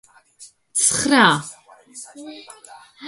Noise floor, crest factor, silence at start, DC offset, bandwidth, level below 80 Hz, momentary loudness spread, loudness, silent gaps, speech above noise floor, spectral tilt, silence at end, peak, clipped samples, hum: -48 dBFS; 22 dB; 0.4 s; under 0.1%; 12 kHz; -58 dBFS; 24 LU; -16 LUFS; none; 29 dB; -2 dB/octave; 0 s; -2 dBFS; under 0.1%; none